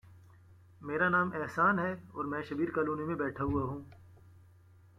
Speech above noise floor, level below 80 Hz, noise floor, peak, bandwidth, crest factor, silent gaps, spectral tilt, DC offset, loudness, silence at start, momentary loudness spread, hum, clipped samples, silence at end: 27 dB; -60 dBFS; -60 dBFS; -16 dBFS; 13.5 kHz; 18 dB; none; -8 dB/octave; under 0.1%; -33 LUFS; 0.05 s; 11 LU; none; under 0.1%; 0.65 s